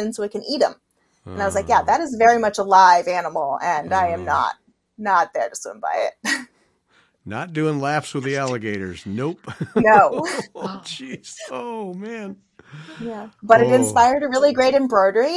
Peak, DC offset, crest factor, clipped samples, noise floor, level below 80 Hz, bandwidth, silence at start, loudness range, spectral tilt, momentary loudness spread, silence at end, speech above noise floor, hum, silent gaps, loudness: 0 dBFS; under 0.1%; 20 dB; under 0.1%; -61 dBFS; -58 dBFS; 12 kHz; 0 s; 8 LU; -4.5 dB/octave; 18 LU; 0 s; 41 dB; none; none; -19 LUFS